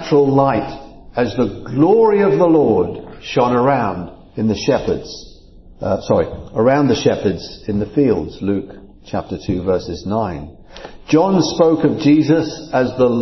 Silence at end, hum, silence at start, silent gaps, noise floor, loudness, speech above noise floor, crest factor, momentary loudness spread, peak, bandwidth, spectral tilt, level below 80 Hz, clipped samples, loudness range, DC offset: 0 s; none; 0 s; none; -41 dBFS; -16 LUFS; 25 dB; 16 dB; 15 LU; 0 dBFS; 6.2 kHz; -7 dB/octave; -42 dBFS; under 0.1%; 5 LU; under 0.1%